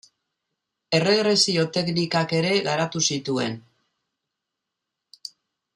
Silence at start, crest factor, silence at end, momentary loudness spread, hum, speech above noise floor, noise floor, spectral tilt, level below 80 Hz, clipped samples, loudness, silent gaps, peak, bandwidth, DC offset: 0.9 s; 20 dB; 2.15 s; 21 LU; none; 61 dB; -83 dBFS; -4 dB/octave; -68 dBFS; under 0.1%; -22 LUFS; none; -6 dBFS; 12 kHz; under 0.1%